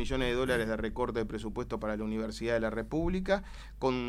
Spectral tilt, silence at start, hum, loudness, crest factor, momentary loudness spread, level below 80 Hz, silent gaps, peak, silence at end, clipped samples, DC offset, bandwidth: -6 dB/octave; 0 s; none; -33 LUFS; 18 dB; 6 LU; -42 dBFS; none; -14 dBFS; 0 s; under 0.1%; under 0.1%; 15.5 kHz